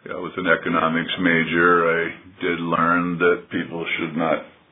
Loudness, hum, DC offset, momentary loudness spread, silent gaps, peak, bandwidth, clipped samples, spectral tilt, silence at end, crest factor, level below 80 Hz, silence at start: -21 LUFS; none; under 0.1%; 10 LU; none; -2 dBFS; 3.9 kHz; under 0.1%; -9.5 dB/octave; 0.2 s; 18 dB; -58 dBFS; 0.05 s